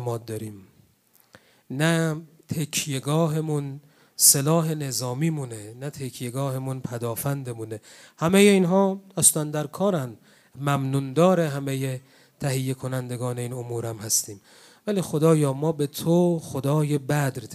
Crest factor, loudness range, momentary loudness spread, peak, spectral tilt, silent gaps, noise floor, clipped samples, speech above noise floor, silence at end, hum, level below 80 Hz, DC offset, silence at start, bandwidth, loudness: 22 dB; 6 LU; 17 LU; -2 dBFS; -4.5 dB/octave; none; -61 dBFS; under 0.1%; 37 dB; 0 s; none; -66 dBFS; under 0.1%; 0 s; 15.5 kHz; -24 LUFS